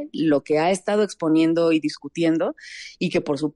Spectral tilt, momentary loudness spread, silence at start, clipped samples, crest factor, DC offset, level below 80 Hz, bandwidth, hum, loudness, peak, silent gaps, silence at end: -5.5 dB/octave; 9 LU; 0 s; under 0.1%; 12 dB; under 0.1%; -64 dBFS; 11 kHz; none; -22 LUFS; -10 dBFS; none; 0.05 s